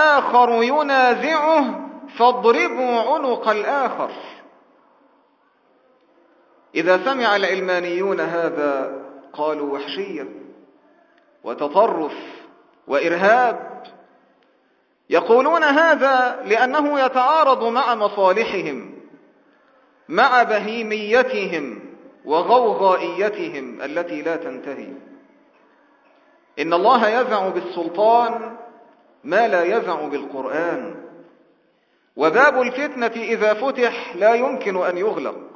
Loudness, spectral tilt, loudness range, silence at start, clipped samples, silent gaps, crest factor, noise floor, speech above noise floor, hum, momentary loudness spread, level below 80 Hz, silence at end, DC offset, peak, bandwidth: -19 LUFS; -4.5 dB/octave; 8 LU; 0 s; under 0.1%; none; 20 dB; -62 dBFS; 44 dB; none; 17 LU; -74 dBFS; 0.05 s; under 0.1%; 0 dBFS; 7.2 kHz